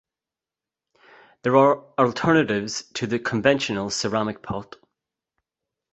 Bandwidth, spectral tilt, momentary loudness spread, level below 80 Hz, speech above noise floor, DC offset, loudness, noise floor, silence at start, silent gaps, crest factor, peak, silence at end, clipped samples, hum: 8.2 kHz; -5 dB/octave; 11 LU; -58 dBFS; 68 dB; under 0.1%; -22 LUFS; -89 dBFS; 1.45 s; none; 22 dB; -2 dBFS; 1.3 s; under 0.1%; none